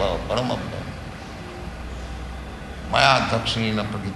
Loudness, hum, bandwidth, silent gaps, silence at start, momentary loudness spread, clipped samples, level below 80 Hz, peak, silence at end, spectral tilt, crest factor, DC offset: -22 LUFS; none; 12 kHz; none; 0 s; 19 LU; under 0.1%; -38 dBFS; 0 dBFS; 0 s; -4.5 dB/octave; 24 dB; under 0.1%